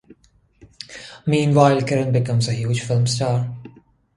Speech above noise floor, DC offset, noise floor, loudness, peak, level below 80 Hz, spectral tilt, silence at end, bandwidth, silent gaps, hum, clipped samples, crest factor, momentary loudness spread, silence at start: 38 dB; under 0.1%; -56 dBFS; -19 LUFS; 0 dBFS; -54 dBFS; -6 dB/octave; 0.5 s; 11.5 kHz; none; none; under 0.1%; 20 dB; 20 LU; 0.9 s